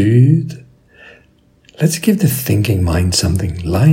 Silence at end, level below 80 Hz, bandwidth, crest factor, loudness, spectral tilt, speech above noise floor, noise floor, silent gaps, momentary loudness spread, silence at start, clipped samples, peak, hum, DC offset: 0 s; -38 dBFS; 16.5 kHz; 14 dB; -14 LUFS; -6 dB/octave; 39 dB; -51 dBFS; none; 7 LU; 0 s; under 0.1%; 0 dBFS; none; under 0.1%